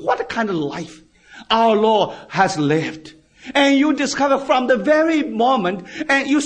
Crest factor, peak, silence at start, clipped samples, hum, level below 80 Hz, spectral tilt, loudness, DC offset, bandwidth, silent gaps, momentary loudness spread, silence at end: 16 dB; -2 dBFS; 0 s; under 0.1%; none; -56 dBFS; -4.5 dB/octave; -17 LUFS; under 0.1%; 9.6 kHz; none; 11 LU; 0 s